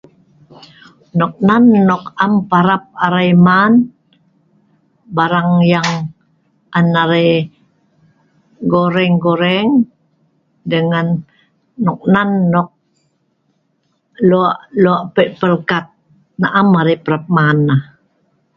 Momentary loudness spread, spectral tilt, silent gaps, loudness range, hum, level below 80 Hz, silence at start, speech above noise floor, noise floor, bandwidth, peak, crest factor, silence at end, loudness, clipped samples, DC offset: 10 LU; -7.5 dB/octave; none; 5 LU; none; -54 dBFS; 1.15 s; 51 dB; -63 dBFS; 7.2 kHz; 0 dBFS; 14 dB; 0.75 s; -13 LUFS; under 0.1%; under 0.1%